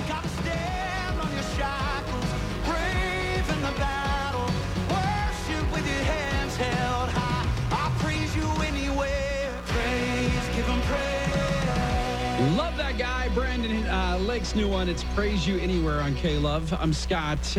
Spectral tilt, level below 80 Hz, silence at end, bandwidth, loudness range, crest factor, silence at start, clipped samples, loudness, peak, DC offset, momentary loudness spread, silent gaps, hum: -5.5 dB/octave; -32 dBFS; 0 s; 15 kHz; 1 LU; 14 dB; 0 s; under 0.1%; -27 LUFS; -12 dBFS; under 0.1%; 3 LU; none; none